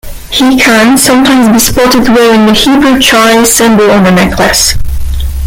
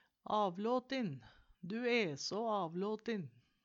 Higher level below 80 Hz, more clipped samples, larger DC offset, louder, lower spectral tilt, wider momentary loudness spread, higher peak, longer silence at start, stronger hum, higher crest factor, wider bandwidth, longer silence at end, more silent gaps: first, -20 dBFS vs -78 dBFS; first, 0.7% vs under 0.1%; neither; first, -5 LUFS vs -38 LUFS; second, -3.5 dB/octave vs -5 dB/octave; second, 5 LU vs 10 LU; first, 0 dBFS vs -22 dBFS; second, 0.05 s vs 0.3 s; neither; second, 6 dB vs 16 dB; first, over 20 kHz vs 7.8 kHz; second, 0 s vs 0.35 s; neither